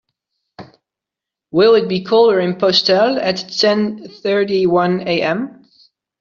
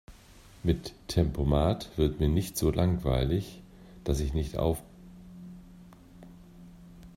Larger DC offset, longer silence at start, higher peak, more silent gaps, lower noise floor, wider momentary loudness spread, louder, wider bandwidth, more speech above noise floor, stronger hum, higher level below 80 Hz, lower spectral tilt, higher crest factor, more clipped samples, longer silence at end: neither; first, 0.6 s vs 0.1 s; first, 0 dBFS vs -12 dBFS; neither; first, -85 dBFS vs -53 dBFS; second, 9 LU vs 23 LU; first, -15 LUFS vs -29 LUFS; second, 7.2 kHz vs 16 kHz; first, 70 dB vs 26 dB; neither; second, -60 dBFS vs -38 dBFS; second, -3.5 dB/octave vs -6.5 dB/octave; about the same, 16 dB vs 20 dB; neither; first, 0.7 s vs 0.05 s